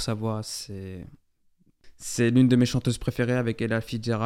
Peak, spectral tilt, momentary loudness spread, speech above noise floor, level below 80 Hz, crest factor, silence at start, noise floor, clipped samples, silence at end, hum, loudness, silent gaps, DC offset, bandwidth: -8 dBFS; -6 dB/octave; 18 LU; 39 dB; -50 dBFS; 18 dB; 0 s; -64 dBFS; under 0.1%; 0 s; none; -25 LUFS; none; under 0.1%; 15.5 kHz